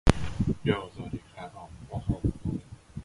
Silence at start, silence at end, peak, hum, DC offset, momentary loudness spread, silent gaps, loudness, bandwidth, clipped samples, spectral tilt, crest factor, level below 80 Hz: 0.05 s; 0 s; 0 dBFS; none; under 0.1%; 16 LU; none; -32 LUFS; 11.5 kHz; under 0.1%; -6.5 dB/octave; 30 dB; -38 dBFS